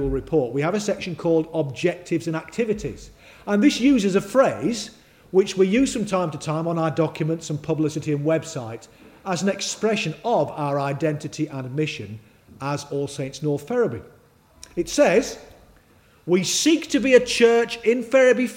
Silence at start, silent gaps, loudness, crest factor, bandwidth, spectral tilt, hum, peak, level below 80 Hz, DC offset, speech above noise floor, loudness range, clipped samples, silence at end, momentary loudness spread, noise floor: 0 s; none; -22 LUFS; 20 dB; 16.5 kHz; -5 dB/octave; none; -2 dBFS; -48 dBFS; under 0.1%; 33 dB; 7 LU; under 0.1%; 0 s; 15 LU; -55 dBFS